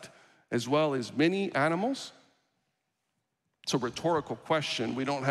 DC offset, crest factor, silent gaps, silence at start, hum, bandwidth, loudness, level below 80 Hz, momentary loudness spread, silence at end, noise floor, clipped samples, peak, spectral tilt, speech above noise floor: under 0.1%; 18 dB; none; 0 s; none; 13.5 kHz; -30 LUFS; -72 dBFS; 7 LU; 0 s; -81 dBFS; under 0.1%; -14 dBFS; -5 dB/octave; 52 dB